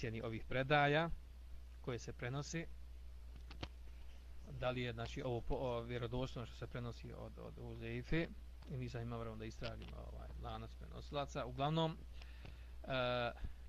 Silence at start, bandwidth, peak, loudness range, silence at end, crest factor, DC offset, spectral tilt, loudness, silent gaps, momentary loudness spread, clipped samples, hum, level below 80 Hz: 0 s; 15 kHz; -22 dBFS; 7 LU; 0 s; 22 dB; under 0.1%; -6 dB/octave; -43 LUFS; none; 18 LU; under 0.1%; none; -54 dBFS